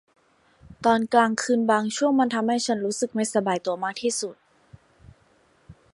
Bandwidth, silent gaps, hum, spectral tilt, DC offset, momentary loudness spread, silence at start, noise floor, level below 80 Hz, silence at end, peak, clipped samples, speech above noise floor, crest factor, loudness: 11.5 kHz; none; none; -3.5 dB/octave; under 0.1%; 6 LU; 0.7 s; -61 dBFS; -62 dBFS; 0.2 s; -4 dBFS; under 0.1%; 38 dB; 20 dB; -23 LUFS